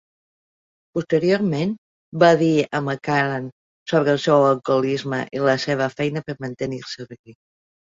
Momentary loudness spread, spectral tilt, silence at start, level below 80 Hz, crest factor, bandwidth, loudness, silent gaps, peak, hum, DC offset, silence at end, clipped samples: 16 LU; -6.5 dB/octave; 0.95 s; -62 dBFS; 20 dB; 7.8 kHz; -20 LUFS; 1.78-2.12 s, 3.52-3.86 s, 7.19-7.24 s; -2 dBFS; none; under 0.1%; 0.6 s; under 0.1%